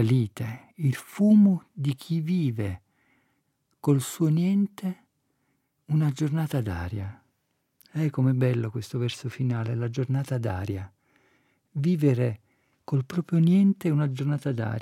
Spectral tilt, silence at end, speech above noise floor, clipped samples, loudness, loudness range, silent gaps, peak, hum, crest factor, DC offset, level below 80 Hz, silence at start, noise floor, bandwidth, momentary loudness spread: -8 dB/octave; 0 s; 50 dB; under 0.1%; -26 LUFS; 5 LU; none; -10 dBFS; none; 16 dB; under 0.1%; -64 dBFS; 0 s; -75 dBFS; 15.5 kHz; 13 LU